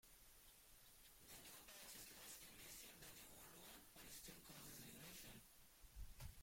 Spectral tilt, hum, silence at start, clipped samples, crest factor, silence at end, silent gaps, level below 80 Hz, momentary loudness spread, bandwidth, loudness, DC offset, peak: -2 dB/octave; none; 0.05 s; under 0.1%; 18 dB; 0 s; none; -70 dBFS; 9 LU; 16.5 kHz; -60 LUFS; under 0.1%; -44 dBFS